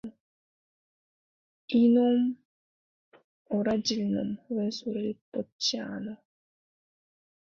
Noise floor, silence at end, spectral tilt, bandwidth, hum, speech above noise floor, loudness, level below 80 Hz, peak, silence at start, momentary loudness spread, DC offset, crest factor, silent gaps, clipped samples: under -90 dBFS; 1.3 s; -5 dB/octave; 7.4 kHz; none; over 63 dB; -28 LUFS; -68 dBFS; -14 dBFS; 0.05 s; 16 LU; under 0.1%; 18 dB; 0.20-1.68 s, 2.45-3.12 s, 3.24-3.45 s, 5.21-5.32 s, 5.52-5.59 s; under 0.1%